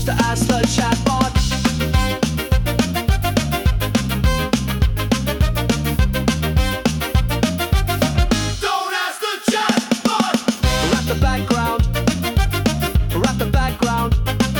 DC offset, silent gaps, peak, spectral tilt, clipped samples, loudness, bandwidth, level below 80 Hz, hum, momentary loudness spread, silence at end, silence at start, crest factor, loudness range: under 0.1%; none; -4 dBFS; -5 dB/octave; under 0.1%; -19 LUFS; 19 kHz; -24 dBFS; none; 2 LU; 0 s; 0 s; 14 dB; 1 LU